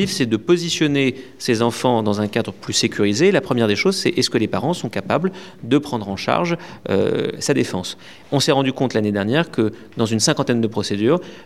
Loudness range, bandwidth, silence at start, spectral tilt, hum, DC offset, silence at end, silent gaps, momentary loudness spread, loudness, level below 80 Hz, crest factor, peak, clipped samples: 3 LU; 15 kHz; 0 s; -4.5 dB/octave; none; 0.4%; 0.05 s; none; 7 LU; -19 LUFS; -60 dBFS; 18 dB; 0 dBFS; under 0.1%